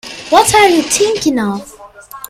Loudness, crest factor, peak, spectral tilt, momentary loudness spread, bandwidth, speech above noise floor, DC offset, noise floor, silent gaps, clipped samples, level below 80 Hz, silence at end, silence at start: -11 LUFS; 14 dB; 0 dBFS; -2.5 dB/octave; 11 LU; 16 kHz; 23 dB; under 0.1%; -34 dBFS; none; 0.2%; -44 dBFS; 0.05 s; 0.05 s